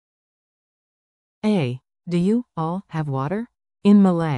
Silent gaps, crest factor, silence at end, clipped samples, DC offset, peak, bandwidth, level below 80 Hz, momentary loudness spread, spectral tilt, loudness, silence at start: none; 16 dB; 0 s; under 0.1%; under 0.1%; -6 dBFS; 10 kHz; -60 dBFS; 13 LU; -8.5 dB/octave; -21 LUFS; 1.45 s